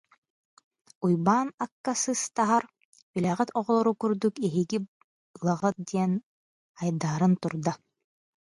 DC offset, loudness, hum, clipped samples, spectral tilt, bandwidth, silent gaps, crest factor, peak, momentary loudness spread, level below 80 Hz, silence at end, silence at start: under 0.1%; -28 LUFS; none; under 0.1%; -6 dB/octave; 11.5 kHz; 1.54-1.58 s, 1.72-1.84 s, 2.85-2.93 s, 3.02-3.14 s, 4.88-5.34 s, 6.26-6.75 s; 20 dB; -8 dBFS; 9 LU; -70 dBFS; 0.7 s; 1 s